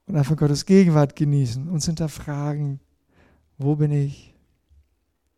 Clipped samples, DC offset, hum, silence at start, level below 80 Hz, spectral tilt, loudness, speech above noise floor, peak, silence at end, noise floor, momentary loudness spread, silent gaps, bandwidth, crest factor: under 0.1%; under 0.1%; none; 0.1 s; -50 dBFS; -7 dB/octave; -21 LUFS; 50 dB; -6 dBFS; 1.2 s; -70 dBFS; 12 LU; none; 13 kHz; 18 dB